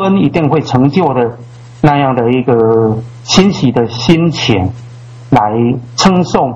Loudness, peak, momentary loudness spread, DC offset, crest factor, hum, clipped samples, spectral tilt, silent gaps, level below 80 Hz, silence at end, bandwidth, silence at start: -11 LUFS; 0 dBFS; 6 LU; under 0.1%; 10 dB; none; 0.5%; -6 dB/octave; none; -38 dBFS; 0 s; 8.2 kHz; 0 s